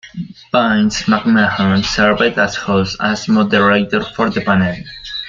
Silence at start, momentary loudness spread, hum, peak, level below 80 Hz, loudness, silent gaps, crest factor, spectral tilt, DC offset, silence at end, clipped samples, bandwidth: 0.05 s; 7 LU; none; 0 dBFS; -42 dBFS; -14 LUFS; none; 14 dB; -5 dB/octave; under 0.1%; 0 s; under 0.1%; 7.6 kHz